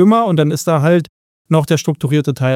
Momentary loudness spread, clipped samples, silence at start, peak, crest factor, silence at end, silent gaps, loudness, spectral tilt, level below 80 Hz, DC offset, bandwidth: 4 LU; under 0.1%; 0 s; 0 dBFS; 12 dB; 0 s; 1.09-1.45 s; -15 LUFS; -6.5 dB/octave; -56 dBFS; under 0.1%; 16 kHz